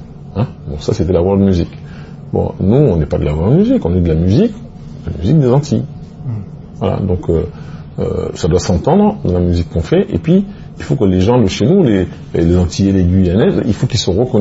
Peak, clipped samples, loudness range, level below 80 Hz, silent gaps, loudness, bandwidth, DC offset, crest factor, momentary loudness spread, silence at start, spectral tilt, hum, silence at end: 0 dBFS; under 0.1%; 4 LU; -30 dBFS; none; -14 LUFS; 8 kHz; under 0.1%; 14 dB; 15 LU; 0 s; -7.5 dB/octave; none; 0 s